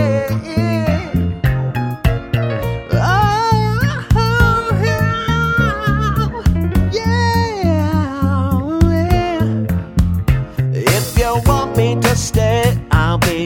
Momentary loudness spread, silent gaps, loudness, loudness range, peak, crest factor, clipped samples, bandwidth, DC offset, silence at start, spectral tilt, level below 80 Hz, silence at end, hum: 5 LU; none; -16 LUFS; 2 LU; 0 dBFS; 14 dB; under 0.1%; 18 kHz; under 0.1%; 0 s; -6 dB/octave; -24 dBFS; 0 s; none